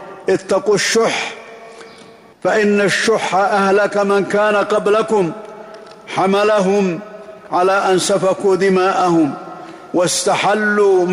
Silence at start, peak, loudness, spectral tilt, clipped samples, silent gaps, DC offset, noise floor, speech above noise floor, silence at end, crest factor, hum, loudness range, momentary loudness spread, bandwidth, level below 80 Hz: 0 s; -6 dBFS; -15 LUFS; -4 dB/octave; under 0.1%; none; under 0.1%; -42 dBFS; 27 dB; 0 s; 10 dB; none; 2 LU; 19 LU; 15.5 kHz; -58 dBFS